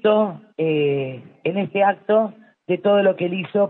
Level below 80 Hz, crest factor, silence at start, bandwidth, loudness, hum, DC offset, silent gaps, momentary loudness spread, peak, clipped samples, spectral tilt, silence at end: -72 dBFS; 14 dB; 0.05 s; 4.1 kHz; -21 LUFS; none; under 0.1%; none; 9 LU; -6 dBFS; under 0.1%; -10 dB/octave; 0 s